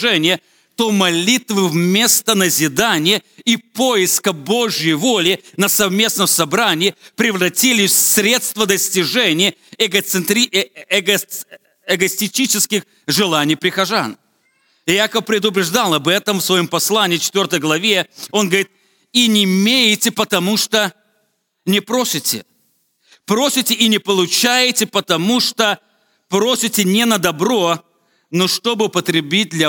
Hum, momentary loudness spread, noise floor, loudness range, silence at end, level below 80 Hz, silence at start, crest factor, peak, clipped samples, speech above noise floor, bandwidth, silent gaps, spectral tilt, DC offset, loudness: none; 6 LU; -65 dBFS; 3 LU; 0 s; -64 dBFS; 0 s; 16 dB; 0 dBFS; under 0.1%; 50 dB; 19 kHz; none; -2.5 dB/octave; under 0.1%; -15 LUFS